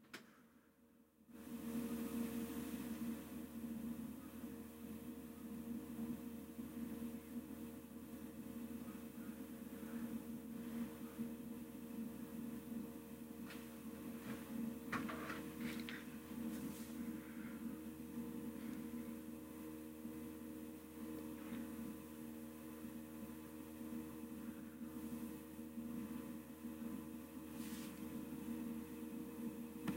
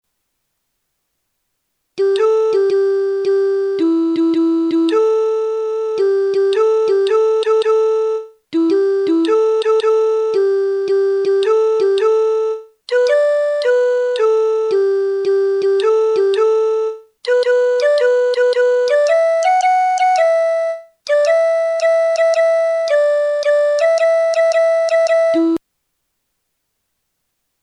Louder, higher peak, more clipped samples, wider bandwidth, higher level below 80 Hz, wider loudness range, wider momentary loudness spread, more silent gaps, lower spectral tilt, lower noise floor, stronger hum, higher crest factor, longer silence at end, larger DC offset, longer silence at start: second, -50 LUFS vs -15 LUFS; second, -30 dBFS vs -4 dBFS; neither; first, 16 kHz vs 10.5 kHz; about the same, -70 dBFS vs -74 dBFS; about the same, 4 LU vs 2 LU; about the same, 6 LU vs 5 LU; neither; first, -5.5 dB/octave vs -3 dB/octave; about the same, -71 dBFS vs -72 dBFS; neither; first, 20 dB vs 12 dB; second, 0 s vs 2.05 s; neither; second, 0 s vs 1.95 s